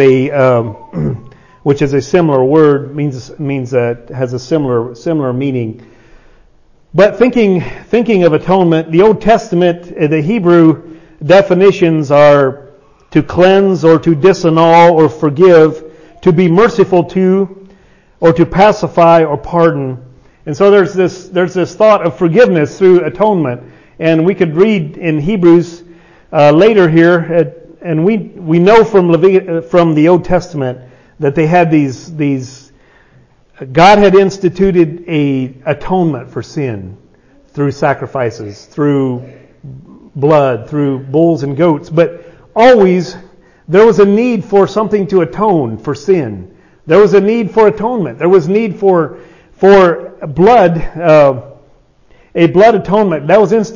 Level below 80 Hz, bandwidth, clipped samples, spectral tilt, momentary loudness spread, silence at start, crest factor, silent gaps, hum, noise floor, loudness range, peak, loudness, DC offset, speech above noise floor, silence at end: -40 dBFS; 7.4 kHz; 0.3%; -7.5 dB/octave; 12 LU; 0 s; 10 dB; none; none; -46 dBFS; 6 LU; 0 dBFS; -10 LUFS; under 0.1%; 37 dB; 0 s